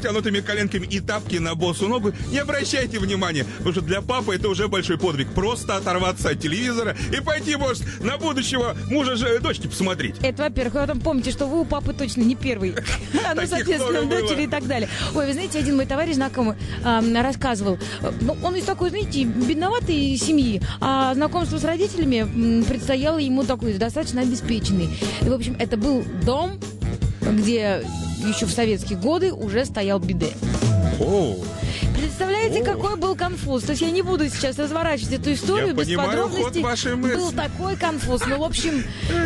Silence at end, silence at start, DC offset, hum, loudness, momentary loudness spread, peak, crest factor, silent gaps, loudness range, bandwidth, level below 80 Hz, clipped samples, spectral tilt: 0 s; 0 s; under 0.1%; none; -22 LUFS; 4 LU; -8 dBFS; 14 dB; none; 2 LU; 13 kHz; -36 dBFS; under 0.1%; -5 dB/octave